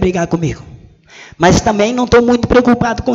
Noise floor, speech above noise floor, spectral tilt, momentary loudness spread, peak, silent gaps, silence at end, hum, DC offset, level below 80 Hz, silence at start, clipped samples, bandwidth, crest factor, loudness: -39 dBFS; 27 dB; -5.5 dB/octave; 8 LU; 0 dBFS; none; 0 s; none; under 0.1%; -30 dBFS; 0 s; under 0.1%; 8 kHz; 12 dB; -12 LUFS